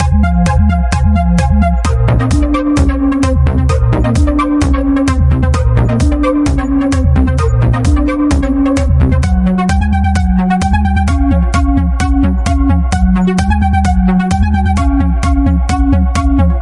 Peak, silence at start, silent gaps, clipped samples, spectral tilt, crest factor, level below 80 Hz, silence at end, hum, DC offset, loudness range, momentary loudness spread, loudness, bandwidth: 0 dBFS; 0 s; none; under 0.1%; -7.5 dB/octave; 10 dB; -14 dBFS; 0 s; none; under 0.1%; 0 LU; 1 LU; -12 LUFS; 11.5 kHz